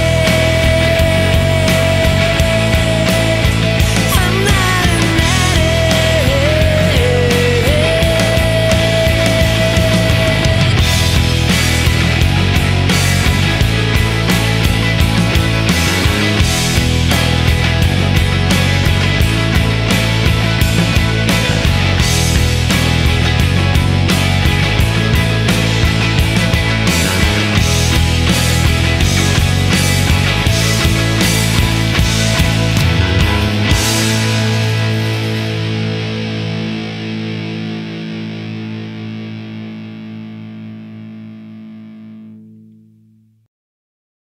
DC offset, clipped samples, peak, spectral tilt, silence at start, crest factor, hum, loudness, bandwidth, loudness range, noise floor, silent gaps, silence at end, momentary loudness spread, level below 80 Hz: under 0.1%; under 0.1%; 0 dBFS; -4.5 dB/octave; 0 s; 12 dB; none; -13 LUFS; 16.5 kHz; 10 LU; -50 dBFS; none; 1.9 s; 10 LU; -22 dBFS